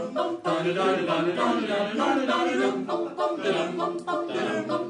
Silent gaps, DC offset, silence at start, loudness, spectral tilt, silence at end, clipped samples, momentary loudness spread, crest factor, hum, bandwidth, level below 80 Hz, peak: none; under 0.1%; 0 s; -26 LUFS; -5 dB/octave; 0 s; under 0.1%; 5 LU; 14 dB; none; 10.5 kHz; -78 dBFS; -12 dBFS